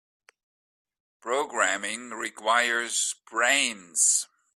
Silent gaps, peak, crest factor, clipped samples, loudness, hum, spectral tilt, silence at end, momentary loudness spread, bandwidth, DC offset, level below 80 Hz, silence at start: none; -8 dBFS; 20 dB; under 0.1%; -25 LUFS; none; 1 dB/octave; 0.3 s; 11 LU; 15.5 kHz; under 0.1%; -78 dBFS; 1.25 s